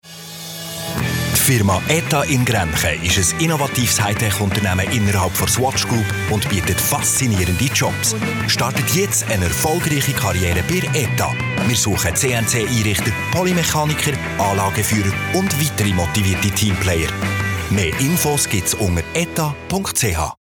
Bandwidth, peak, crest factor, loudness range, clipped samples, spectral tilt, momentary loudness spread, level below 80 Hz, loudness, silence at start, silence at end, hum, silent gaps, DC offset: over 20 kHz; -4 dBFS; 14 dB; 1 LU; under 0.1%; -4 dB/octave; 4 LU; -40 dBFS; -17 LUFS; 0.05 s; 0.05 s; none; none; under 0.1%